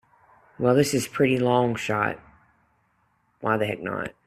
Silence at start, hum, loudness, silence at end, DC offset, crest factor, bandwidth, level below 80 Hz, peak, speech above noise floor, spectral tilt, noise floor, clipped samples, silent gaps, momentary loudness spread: 0.6 s; none; -24 LUFS; 0.15 s; under 0.1%; 20 dB; 14 kHz; -62 dBFS; -6 dBFS; 44 dB; -5.5 dB/octave; -68 dBFS; under 0.1%; none; 10 LU